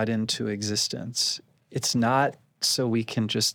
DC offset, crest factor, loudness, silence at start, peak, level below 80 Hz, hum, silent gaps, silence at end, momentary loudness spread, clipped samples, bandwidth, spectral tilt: under 0.1%; 16 dB; -26 LUFS; 0 s; -10 dBFS; -72 dBFS; none; none; 0 s; 5 LU; under 0.1%; over 20 kHz; -3.5 dB/octave